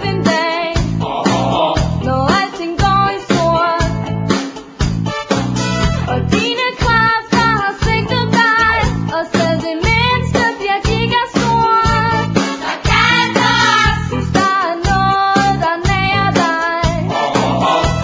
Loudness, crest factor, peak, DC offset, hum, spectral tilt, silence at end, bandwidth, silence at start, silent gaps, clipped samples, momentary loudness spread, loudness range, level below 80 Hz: -14 LUFS; 14 dB; 0 dBFS; under 0.1%; none; -5 dB/octave; 0 s; 8 kHz; 0 s; none; under 0.1%; 6 LU; 3 LU; -28 dBFS